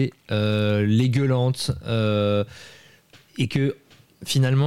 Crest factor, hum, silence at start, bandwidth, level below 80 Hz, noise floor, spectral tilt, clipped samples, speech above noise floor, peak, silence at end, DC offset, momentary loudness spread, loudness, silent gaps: 14 dB; none; 0 s; 14 kHz; -52 dBFS; -53 dBFS; -6.5 dB/octave; under 0.1%; 32 dB; -8 dBFS; 0 s; 0.3%; 15 LU; -23 LUFS; none